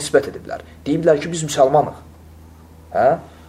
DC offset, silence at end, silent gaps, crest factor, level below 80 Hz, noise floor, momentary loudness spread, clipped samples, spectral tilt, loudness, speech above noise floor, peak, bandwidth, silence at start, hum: under 0.1%; 0.2 s; none; 18 dB; -48 dBFS; -43 dBFS; 14 LU; under 0.1%; -5 dB/octave; -18 LUFS; 25 dB; -2 dBFS; 15 kHz; 0 s; none